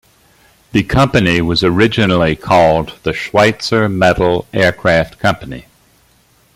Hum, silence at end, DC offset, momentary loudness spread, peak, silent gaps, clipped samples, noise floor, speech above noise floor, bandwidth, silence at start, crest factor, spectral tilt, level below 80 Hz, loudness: none; 0.95 s; under 0.1%; 7 LU; 0 dBFS; none; under 0.1%; -52 dBFS; 39 dB; 16 kHz; 0.75 s; 14 dB; -6 dB/octave; -36 dBFS; -13 LUFS